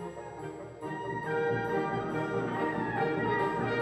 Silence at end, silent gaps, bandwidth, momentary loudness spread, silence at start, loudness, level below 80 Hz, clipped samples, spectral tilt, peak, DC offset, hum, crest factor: 0 s; none; 14 kHz; 12 LU; 0 s; -32 LUFS; -60 dBFS; under 0.1%; -7 dB/octave; -18 dBFS; under 0.1%; none; 14 dB